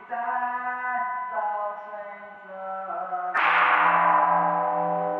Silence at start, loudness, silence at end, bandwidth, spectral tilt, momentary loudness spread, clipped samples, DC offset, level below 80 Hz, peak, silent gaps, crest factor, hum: 0 s; -24 LUFS; 0 s; 6 kHz; -6 dB/octave; 18 LU; under 0.1%; under 0.1%; -88 dBFS; -8 dBFS; none; 18 dB; none